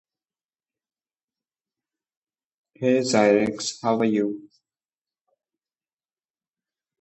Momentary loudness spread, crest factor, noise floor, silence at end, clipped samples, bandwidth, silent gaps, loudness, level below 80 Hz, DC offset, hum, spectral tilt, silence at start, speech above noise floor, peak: 9 LU; 22 dB; under -90 dBFS; 2.6 s; under 0.1%; 8.6 kHz; none; -22 LUFS; -68 dBFS; under 0.1%; none; -4.5 dB/octave; 2.8 s; over 69 dB; -6 dBFS